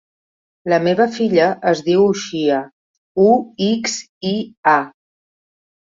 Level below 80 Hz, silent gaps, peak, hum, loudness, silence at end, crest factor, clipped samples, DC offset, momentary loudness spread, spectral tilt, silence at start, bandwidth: -62 dBFS; 2.73-3.15 s, 4.09-4.21 s, 4.57-4.63 s; -2 dBFS; none; -17 LUFS; 0.95 s; 16 dB; under 0.1%; under 0.1%; 9 LU; -5 dB/octave; 0.65 s; 7.8 kHz